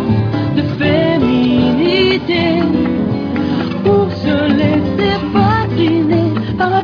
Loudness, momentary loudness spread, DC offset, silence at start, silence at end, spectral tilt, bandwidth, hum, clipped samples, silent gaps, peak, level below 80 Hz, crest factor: -14 LUFS; 4 LU; under 0.1%; 0 s; 0 s; -8.5 dB/octave; 5.4 kHz; none; under 0.1%; none; -2 dBFS; -36 dBFS; 12 dB